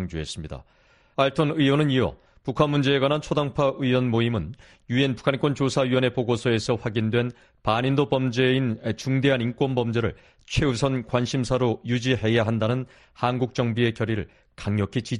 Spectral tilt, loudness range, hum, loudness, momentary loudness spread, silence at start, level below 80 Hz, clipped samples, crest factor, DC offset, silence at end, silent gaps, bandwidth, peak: -6.5 dB/octave; 2 LU; none; -24 LUFS; 9 LU; 0 s; -46 dBFS; under 0.1%; 18 dB; under 0.1%; 0 s; none; 11 kHz; -6 dBFS